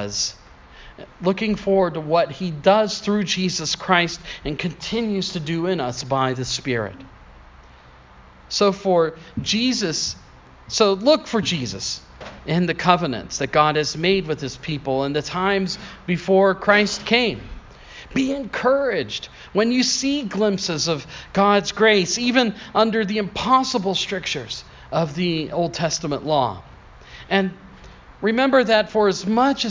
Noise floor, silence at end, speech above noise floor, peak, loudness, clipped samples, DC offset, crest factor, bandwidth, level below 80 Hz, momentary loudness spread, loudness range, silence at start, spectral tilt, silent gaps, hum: -47 dBFS; 0 s; 26 dB; 0 dBFS; -21 LUFS; under 0.1%; under 0.1%; 20 dB; 7.6 kHz; -48 dBFS; 10 LU; 5 LU; 0 s; -4 dB/octave; none; none